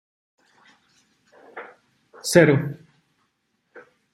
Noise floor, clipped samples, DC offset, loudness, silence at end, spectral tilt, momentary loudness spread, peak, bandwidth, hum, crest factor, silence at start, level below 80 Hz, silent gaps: -72 dBFS; under 0.1%; under 0.1%; -19 LUFS; 0.35 s; -5.5 dB/octave; 27 LU; -2 dBFS; 15.5 kHz; none; 24 dB; 1.55 s; -64 dBFS; none